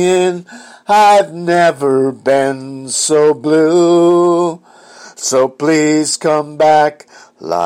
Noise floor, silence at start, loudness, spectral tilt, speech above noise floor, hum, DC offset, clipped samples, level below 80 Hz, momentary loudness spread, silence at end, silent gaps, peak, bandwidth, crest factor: -38 dBFS; 0 s; -12 LUFS; -4 dB/octave; 26 dB; none; under 0.1%; under 0.1%; -62 dBFS; 10 LU; 0 s; none; -2 dBFS; 15.5 kHz; 10 dB